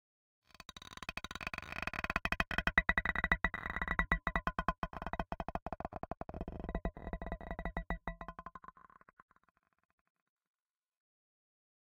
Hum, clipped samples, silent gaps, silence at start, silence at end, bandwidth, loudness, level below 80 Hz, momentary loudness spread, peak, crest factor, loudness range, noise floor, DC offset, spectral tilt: none; under 0.1%; 4.78-4.82 s, 5.62-5.66 s; 0.75 s; 3.1 s; 16.5 kHz; -38 LUFS; -48 dBFS; 16 LU; -12 dBFS; 30 dB; 14 LU; -59 dBFS; under 0.1%; -5 dB/octave